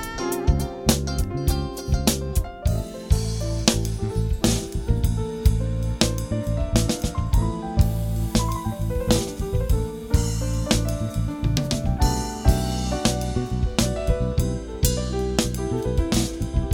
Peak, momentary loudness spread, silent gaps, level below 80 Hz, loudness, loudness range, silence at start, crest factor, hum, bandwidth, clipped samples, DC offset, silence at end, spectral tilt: -2 dBFS; 4 LU; none; -26 dBFS; -24 LUFS; 1 LU; 0 s; 22 dB; none; 18.5 kHz; under 0.1%; under 0.1%; 0 s; -5 dB/octave